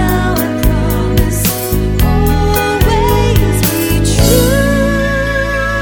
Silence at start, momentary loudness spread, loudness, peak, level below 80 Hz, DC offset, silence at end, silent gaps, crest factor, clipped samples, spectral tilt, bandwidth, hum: 0 s; 4 LU; -12 LUFS; 0 dBFS; -16 dBFS; under 0.1%; 0 s; none; 12 dB; under 0.1%; -5 dB/octave; over 20 kHz; none